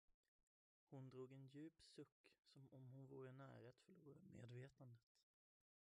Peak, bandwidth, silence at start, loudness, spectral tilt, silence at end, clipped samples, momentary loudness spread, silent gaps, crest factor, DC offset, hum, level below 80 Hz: -48 dBFS; 10 kHz; 0.1 s; -63 LUFS; -7 dB/octave; 0.65 s; under 0.1%; 8 LU; 0.14-0.87 s, 2.12-2.24 s, 2.39-2.43 s, 5.03-5.15 s; 16 dB; under 0.1%; none; under -90 dBFS